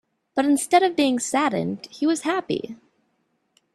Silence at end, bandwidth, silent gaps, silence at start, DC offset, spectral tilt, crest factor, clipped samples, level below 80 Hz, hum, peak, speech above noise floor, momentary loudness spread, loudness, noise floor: 1 s; 13 kHz; none; 0.35 s; under 0.1%; -4 dB/octave; 18 dB; under 0.1%; -68 dBFS; none; -6 dBFS; 49 dB; 11 LU; -22 LUFS; -70 dBFS